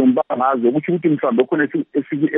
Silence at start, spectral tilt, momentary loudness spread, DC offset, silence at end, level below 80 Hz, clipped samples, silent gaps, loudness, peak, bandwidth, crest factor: 0 s; -6.5 dB/octave; 4 LU; under 0.1%; 0 s; -74 dBFS; under 0.1%; none; -18 LUFS; -2 dBFS; 3.8 kHz; 14 dB